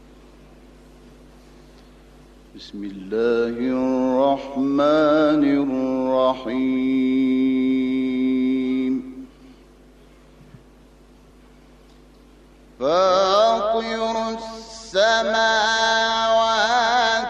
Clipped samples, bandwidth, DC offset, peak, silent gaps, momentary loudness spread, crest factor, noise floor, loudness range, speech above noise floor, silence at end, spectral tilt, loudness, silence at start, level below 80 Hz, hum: under 0.1%; 8.6 kHz; under 0.1%; -6 dBFS; none; 11 LU; 16 dB; -49 dBFS; 9 LU; 30 dB; 0 s; -4 dB/octave; -20 LUFS; 2.55 s; -52 dBFS; none